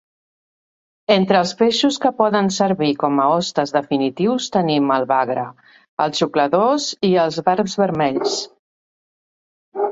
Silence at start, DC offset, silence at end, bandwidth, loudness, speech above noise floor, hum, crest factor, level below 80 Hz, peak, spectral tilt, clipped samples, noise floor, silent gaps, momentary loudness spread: 1.1 s; under 0.1%; 0 s; 8 kHz; -18 LUFS; over 73 dB; none; 18 dB; -62 dBFS; -2 dBFS; -5 dB/octave; under 0.1%; under -90 dBFS; 5.89-5.97 s, 8.59-9.72 s; 7 LU